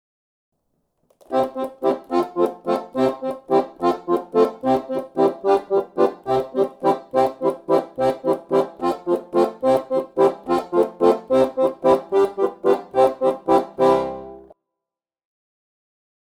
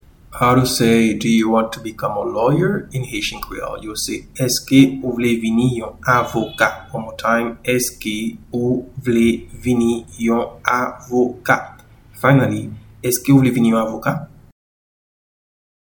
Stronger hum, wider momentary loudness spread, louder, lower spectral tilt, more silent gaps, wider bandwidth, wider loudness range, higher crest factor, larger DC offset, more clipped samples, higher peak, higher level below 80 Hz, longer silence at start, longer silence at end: neither; second, 6 LU vs 11 LU; second, -21 LUFS vs -18 LUFS; first, -6.5 dB/octave vs -5 dB/octave; neither; second, 15.5 kHz vs 19.5 kHz; about the same, 4 LU vs 3 LU; about the same, 18 dB vs 18 dB; neither; neither; second, -4 dBFS vs 0 dBFS; second, -58 dBFS vs -44 dBFS; first, 1.3 s vs 0.3 s; first, 2 s vs 1.55 s